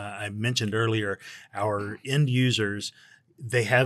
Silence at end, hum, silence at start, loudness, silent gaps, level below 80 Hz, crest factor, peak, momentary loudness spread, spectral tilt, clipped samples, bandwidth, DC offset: 0 s; none; 0 s; -27 LUFS; none; -70 dBFS; 18 dB; -8 dBFS; 13 LU; -5 dB/octave; under 0.1%; 13 kHz; under 0.1%